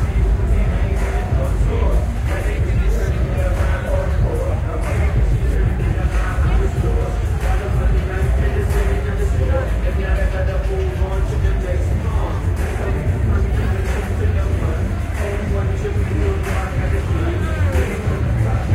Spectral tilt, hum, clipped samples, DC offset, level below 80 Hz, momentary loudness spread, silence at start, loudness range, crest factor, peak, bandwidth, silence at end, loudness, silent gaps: -7.5 dB/octave; none; under 0.1%; under 0.1%; -20 dBFS; 3 LU; 0 s; 1 LU; 12 dB; -4 dBFS; 13.5 kHz; 0 s; -20 LUFS; none